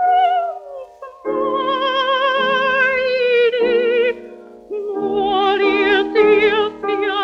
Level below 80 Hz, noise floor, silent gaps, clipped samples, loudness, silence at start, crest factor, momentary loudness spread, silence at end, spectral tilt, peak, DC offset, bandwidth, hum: -54 dBFS; -37 dBFS; none; under 0.1%; -16 LUFS; 0 s; 14 dB; 14 LU; 0 s; -4.5 dB/octave; -2 dBFS; under 0.1%; 6.8 kHz; none